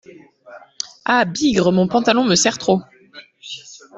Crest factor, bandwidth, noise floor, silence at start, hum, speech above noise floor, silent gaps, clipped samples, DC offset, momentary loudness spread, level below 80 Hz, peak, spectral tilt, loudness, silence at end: 16 dB; 8.4 kHz; -44 dBFS; 0.5 s; none; 28 dB; none; under 0.1%; under 0.1%; 18 LU; -54 dBFS; -2 dBFS; -4 dB/octave; -17 LUFS; 0 s